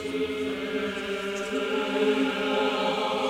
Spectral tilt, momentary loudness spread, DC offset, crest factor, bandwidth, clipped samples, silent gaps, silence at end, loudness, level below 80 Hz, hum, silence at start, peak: -4 dB/octave; 6 LU; under 0.1%; 14 dB; 16 kHz; under 0.1%; none; 0 s; -27 LUFS; -60 dBFS; none; 0 s; -12 dBFS